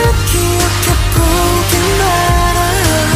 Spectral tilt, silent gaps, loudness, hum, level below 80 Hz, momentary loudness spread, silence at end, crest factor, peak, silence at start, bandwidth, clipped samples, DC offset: -4 dB/octave; none; -12 LUFS; none; -18 dBFS; 1 LU; 0 s; 10 dB; 0 dBFS; 0 s; 16 kHz; under 0.1%; under 0.1%